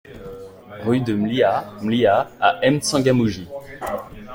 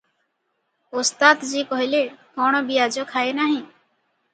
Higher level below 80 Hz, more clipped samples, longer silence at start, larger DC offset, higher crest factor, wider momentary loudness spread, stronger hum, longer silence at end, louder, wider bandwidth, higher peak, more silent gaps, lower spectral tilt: first, -50 dBFS vs -76 dBFS; neither; second, 0.05 s vs 0.95 s; neither; about the same, 18 dB vs 22 dB; first, 19 LU vs 9 LU; neither; second, 0 s vs 0.7 s; about the same, -20 LUFS vs -20 LUFS; first, 16.5 kHz vs 9.4 kHz; about the same, -2 dBFS vs 0 dBFS; neither; first, -5.5 dB/octave vs -1.5 dB/octave